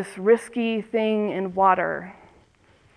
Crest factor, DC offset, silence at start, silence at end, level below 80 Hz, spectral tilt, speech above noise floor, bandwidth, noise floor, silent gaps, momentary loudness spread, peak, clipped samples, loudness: 18 dB; under 0.1%; 0 s; 0.85 s; -64 dBFS; -6 dB/octave; 35 dB; 11 kHz; -58 dBFS; none; 9 LU; -6 dBFS; under 0.1%; -23 LUFS